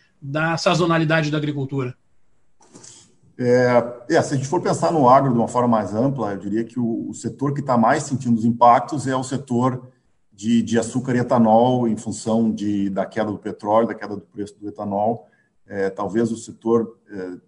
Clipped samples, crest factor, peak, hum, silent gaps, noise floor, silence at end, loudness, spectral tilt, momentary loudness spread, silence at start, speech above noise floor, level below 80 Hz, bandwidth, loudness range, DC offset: under 0.1%; 20 dB; -2 dBFS; none; none; -64 dBFS; 0.1 s; -20 LUFS; -6.5 dB/octave; 14 LU; 0.25 s; 45 dB; -62 dBFS; 11 kHz; 6 LU; under 0.1%